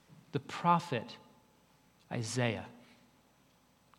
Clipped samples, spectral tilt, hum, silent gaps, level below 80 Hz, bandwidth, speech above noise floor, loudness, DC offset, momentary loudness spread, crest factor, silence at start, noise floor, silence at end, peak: under 0.1%; -5 dB/octave; none; none; -78 dBFS; 16.5 kHz; 34 dB; -35 LUFS; under 0.1%; 20 LU; 22 dB; 0.1 s; -68 dBFS; 1.2 s; -16 dBFS